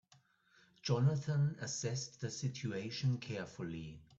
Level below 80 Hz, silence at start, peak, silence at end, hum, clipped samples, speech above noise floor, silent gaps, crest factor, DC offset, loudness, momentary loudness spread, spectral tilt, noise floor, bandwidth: -70 dBFS; 0.85 s; -22 dBFS; 0.15 s; none; under 0.1%; 33 dB; none; 18 dB; under 0.1%; -38 LUFS; 11 LU; -5.5 dB/octave; -70 dBFS; 8 kHz